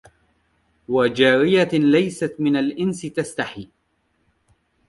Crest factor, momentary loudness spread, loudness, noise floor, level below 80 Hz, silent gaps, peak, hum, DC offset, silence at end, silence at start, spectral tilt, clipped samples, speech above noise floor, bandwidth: 18 dB; 11 LU; -19 LUFS; -68 dBFS; -58 dBFS; none; -4 dBFS; none; under 0.1%; 1.25 s; 0.9 s; -5.5 dB/octave; under 0.1%; 49 dB; 11.5 kHz